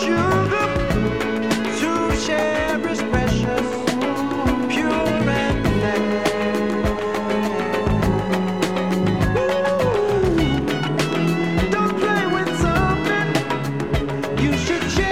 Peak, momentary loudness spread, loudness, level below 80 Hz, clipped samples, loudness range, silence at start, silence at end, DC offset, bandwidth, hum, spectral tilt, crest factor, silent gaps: -4 dBFS; 3 LU; -20 LUFS; -34 dBFS; under 0.1%; 1 LU; 0 s; 0 s; 0.7%; 16.5 kHz; none; -6 dB/octave; 16 dB; none